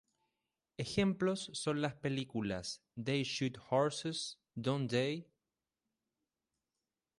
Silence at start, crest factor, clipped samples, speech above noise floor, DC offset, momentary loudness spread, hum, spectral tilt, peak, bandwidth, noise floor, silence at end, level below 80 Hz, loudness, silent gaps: 0.8 s; 20 dB; under 0.1%; over 53 dB; under 0.1%; 9 LU; none; -5 dB/octave; -20 dBFS; 11.5 kHz; under -90 dBFS; 1.95 s; -68 dBFS; -37 LUFS; none